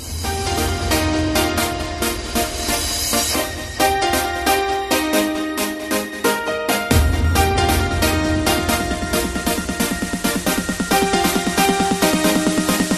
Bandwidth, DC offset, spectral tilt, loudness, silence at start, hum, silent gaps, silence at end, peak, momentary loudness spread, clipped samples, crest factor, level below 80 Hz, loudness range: 13.5 kHz; under 0.1%; -3.5 dB/octave; -18 LUFS; 0 s; none; none; 0 s; -2 dBFS; 5 LU; under 0.1%; 18 dB; -30 dBFS; 1 LU